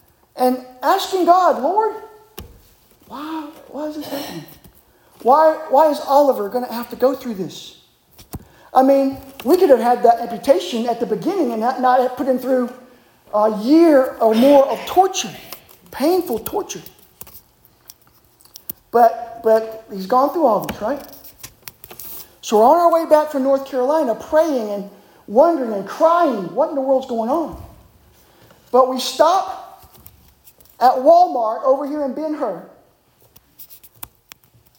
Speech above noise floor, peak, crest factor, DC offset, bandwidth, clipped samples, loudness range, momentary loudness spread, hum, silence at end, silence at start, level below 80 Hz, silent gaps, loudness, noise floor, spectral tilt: 39 dB; -2 dBFS; 16 dB; under 0.1%; 17 kHz; under 0.1%; 6 LU; 22 LU; none; 1.05 s; 0.35 s; -54 dBFS; none; -17 LUFS; -55 dBFS; -4.5 dB/octave